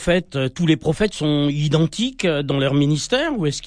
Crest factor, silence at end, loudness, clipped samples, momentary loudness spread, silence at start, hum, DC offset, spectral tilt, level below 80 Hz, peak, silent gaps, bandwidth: 14 dB; 0 s; -20 LUFS; under 0.1%; 3 LU; 0 s; none; under 0.1%; -5.5 dB/octave; -42 dBFS; -4 dBFS; none; 10.5 kHz